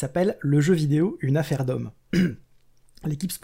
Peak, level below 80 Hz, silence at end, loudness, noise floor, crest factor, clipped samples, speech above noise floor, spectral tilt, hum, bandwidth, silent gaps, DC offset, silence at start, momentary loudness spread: -10 dBFS; -54 dBFS; 0.05 s; -24 LUFS; -56 dBFS; 14 dB; under 0.1%; 33 dB; -7 dB/octave; none; 16 kHz; none; under 0.1%; 0 s; 11 LU